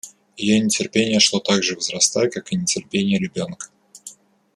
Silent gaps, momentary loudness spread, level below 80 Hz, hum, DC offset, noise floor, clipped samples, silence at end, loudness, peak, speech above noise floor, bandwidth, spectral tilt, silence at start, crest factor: none; 23 LU; -60 dBFS; none; under 0.1%; -44 dBFS; under 0.1%; 0.45 s; -19 LUFS; -2 dBFS; 24 dB; 13 kHz; -3 dB/octave; 0.05 s; 20 dB